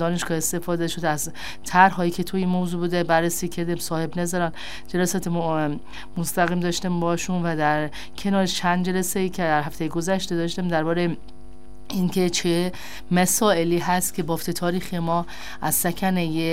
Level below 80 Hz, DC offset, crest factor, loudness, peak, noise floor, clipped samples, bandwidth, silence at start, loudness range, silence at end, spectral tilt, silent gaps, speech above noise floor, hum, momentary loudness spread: -48 dBFS; 2%; 22 dB; -23 LUFS; -2 dBFS; -45 dBFS; under 0.1%; 16 kHz; 0 s; 3 LU; 0 s; -4.5 dB/octave; none; 22 dB; none; 8 LU